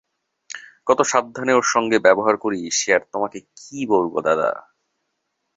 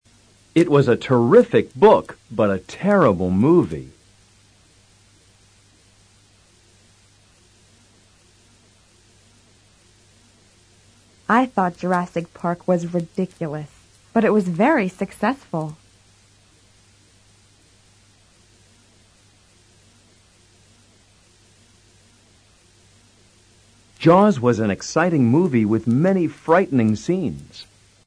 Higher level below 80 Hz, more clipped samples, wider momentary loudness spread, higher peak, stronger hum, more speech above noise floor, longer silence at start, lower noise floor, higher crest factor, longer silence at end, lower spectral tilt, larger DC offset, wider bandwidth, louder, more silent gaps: second, -64 dBFS vs -56 dBFS; neither; first, 20 LU vs 14 LU; about the same, -2 dBFS vs -2 dBFS; neither; first, 56 dB vs 37 dB; about the same, 0.55 s vs 0.55 s; first, -75 dBFS vs -55 dBFS; about the same, 20 dB vs 20 dB; first, 0.95 s vs 0.45 s; second, -3 dB/octave vs -7.5 dB/octave; neither; second, 8 kHz vs 11 kHz; about the same, -19 LUFS vs -19 LUFS; neither